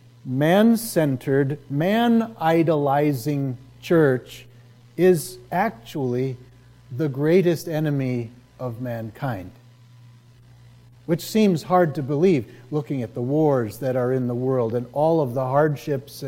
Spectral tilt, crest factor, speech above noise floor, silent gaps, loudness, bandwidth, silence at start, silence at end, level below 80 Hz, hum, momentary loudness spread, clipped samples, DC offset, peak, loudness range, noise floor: -7 dB/octave; 16 dB; 28 dB; none; -22 LUFS; 16.5 kHz; 0.25 s; 0 s; -60 dBFS; none; 12 LU; under 0.1%; under 0.1%; -6 dBFS; 6 LU; -49 dBFS